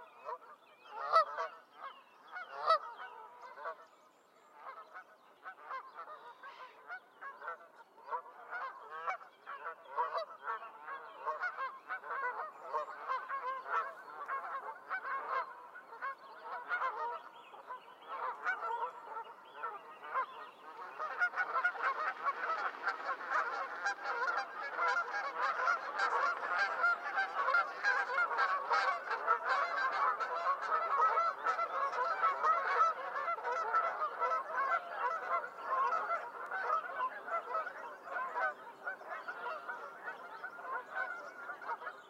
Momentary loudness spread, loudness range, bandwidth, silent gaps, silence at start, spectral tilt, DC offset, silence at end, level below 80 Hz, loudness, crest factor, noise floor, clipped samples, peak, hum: 17 LU; 12 LU; 15 kHz; none; 0 s; -1 dB/octave; under 0.1%; 0 s; under -90 dBFS; -37 LUFS; 22 dB; -65 dBFS; under 0.1%; -16 dBFS; none